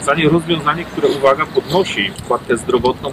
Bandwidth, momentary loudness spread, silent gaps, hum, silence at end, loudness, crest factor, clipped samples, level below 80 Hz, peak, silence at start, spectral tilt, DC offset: 15.5 kHz; 5 LU; none; none; 0 s; -16 LUFS; 14 dB; under 0.1%; -42 dBFS; -2 dBFS; 0 s; -5 dB/octave; under 0.1%